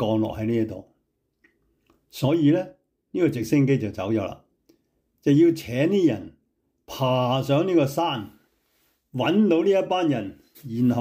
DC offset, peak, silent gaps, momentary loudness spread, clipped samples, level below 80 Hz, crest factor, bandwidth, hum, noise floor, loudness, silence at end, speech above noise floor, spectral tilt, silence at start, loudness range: under 0.1%; -8 dBFS; none; 15 LU; under 0.1%; -60 dBFS; 16 dB; 16 kHz; none; -73 dBFS; -23 LUFS; 0 s; 51 dB; -7 dB/octave; 0 s; 3 LU